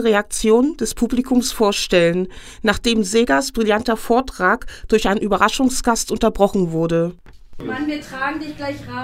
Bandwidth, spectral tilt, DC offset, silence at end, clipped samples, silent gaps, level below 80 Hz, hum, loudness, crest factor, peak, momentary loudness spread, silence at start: 16 kHz; -4 dB/octave; under 0.1%; 0 s; under 0.1%; none; -36 dBFS; none; -18 LUFS; 18 dB; 0 dBFS; 9 LU; 0 s